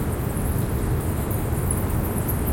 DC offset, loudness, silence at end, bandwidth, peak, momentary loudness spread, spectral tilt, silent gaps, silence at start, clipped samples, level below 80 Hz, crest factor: under 0.1%; -25 LUFS; 0 s; 17 kHz; -8 dBFS; 2 LU; -6.5 dB/octave; none; 0 s; under 0.1%; -30 dBFS; 14 dB